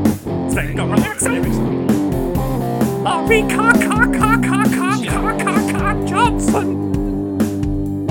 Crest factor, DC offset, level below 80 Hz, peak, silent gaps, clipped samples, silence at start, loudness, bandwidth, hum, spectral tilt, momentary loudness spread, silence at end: 16 dB; under 0.1%; -30 dBFS; 0 dBFS; none; under 0.1%; 0 s; -17 LUFS; 18.5 kHz; none; -5.5 dB/octave; 7 LU; 0 s